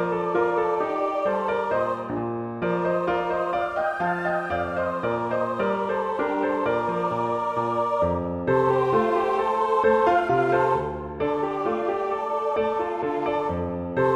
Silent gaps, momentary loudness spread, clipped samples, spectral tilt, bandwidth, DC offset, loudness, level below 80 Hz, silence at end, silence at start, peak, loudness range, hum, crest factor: none; 6 LU; under 0.1%; -7.5 dB/octave; 10 kHz; under 0.1%; -24 LUFS; -52 dBFS; 0 s; 0 s; -8 dBFS; 4 LU; none; 16 dB